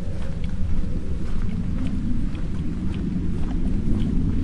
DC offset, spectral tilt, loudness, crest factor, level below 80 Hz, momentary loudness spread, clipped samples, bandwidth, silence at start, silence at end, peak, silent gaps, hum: under 0.1%; -8.5 dB/octave; -28 LUFS; 12 dB; -26 dBFS; 5 LU; under 0.1%; 5.8 kHz; 0 s; 0 s; -8 dBFS; none; none